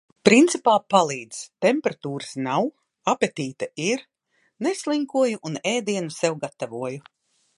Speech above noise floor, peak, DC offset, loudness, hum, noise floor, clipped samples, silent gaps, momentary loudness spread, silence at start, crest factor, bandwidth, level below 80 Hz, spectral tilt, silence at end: 46 dB; 0 dBFS; under 0.1%; -23 LUFS; none; -68 dBFS; under 0.1%; none; 14 LU; 0.25 s; 24 dB; 11.5 kHz; -70 dBFS; -4 dB/octave; 0.6 s